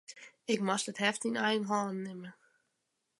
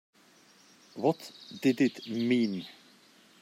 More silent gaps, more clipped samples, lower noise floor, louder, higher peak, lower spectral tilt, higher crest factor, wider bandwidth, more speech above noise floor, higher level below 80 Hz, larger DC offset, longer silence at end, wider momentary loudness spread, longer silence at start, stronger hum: neither; neither; first, -83 dBFS vs -61 dBFS; second, -33 LUFS vs -30 LUFS; about the same, -14 dBFS vs -14 dBFS; second, -3.5 dB/octave vs -6 dB/octave; about the same, 22 dB vs 18 dB; second, 11.5 kHz vs 15.5 kHz; first, 49 dB vs 31 dB; about the same, -84 dBFS vs -82 dBFS; neither; first, 0.9 s vs 0.7 s; about the same, 16 LU vs 18 LU; second, 0.1 s vs 0.95 s; neither